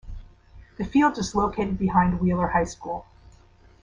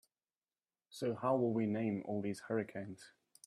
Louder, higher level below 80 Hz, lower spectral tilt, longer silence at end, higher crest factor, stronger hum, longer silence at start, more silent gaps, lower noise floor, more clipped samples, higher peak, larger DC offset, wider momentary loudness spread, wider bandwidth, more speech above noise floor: first, -24 LUFS vs -38 LUFS; first, -42 dBFS vs -82 dBFS; about the same, -6.5 dB/octave vs -7 dB/octave; first, 0.8 s vs 0.4 s; about the same, 18 dB vs 18 dB; neither; second, 0.05 s vs 0.9 s; neither; second, -53 dBFS vs under -90 dBFS; neither; first, -6 dBFS vs -22 dBFS; neither; second, 13 LU vs 16 LU; second, 9.8 kHz vs 13.5 kHz; second, 30 dB vs over 53 dB